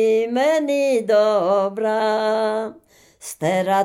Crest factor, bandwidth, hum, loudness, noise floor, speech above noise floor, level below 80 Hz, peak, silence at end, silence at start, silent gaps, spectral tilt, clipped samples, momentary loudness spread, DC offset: 12 dB; 16.5 kHz; none; -19 LUFS; -40 dBFS; 21 dB; -70 dBFS; -6 dBFS; 0 s; 0 s; none; -5 dB/octave; under 0.1%; 10 LU; under 0.1%